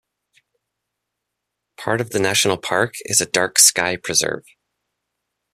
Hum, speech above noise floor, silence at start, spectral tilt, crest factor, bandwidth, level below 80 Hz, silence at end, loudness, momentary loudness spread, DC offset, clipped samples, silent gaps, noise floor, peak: none; 61 dB; 1.8 s; -1.5 dB/octave; 22 dB; 14.5 kHz; -60 dBFS; 1.15 s; -17 LUFS; 12 LU; under 0.1%; under 0.1%; none; -80 dBFS; 0 dBFS